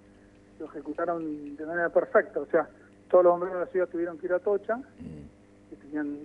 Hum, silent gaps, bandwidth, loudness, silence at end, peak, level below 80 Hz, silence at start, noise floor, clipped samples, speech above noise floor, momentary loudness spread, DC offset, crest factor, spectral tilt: none; none; 3.6 kHz; -28 LUFS; 0 s; -10 dBFS; -64 dBFS; 0.6 s; -55 dBFS; under 0.1%; 28 dB; 19 LU; under 0.1%; 20 dB; -8.5 dB/octave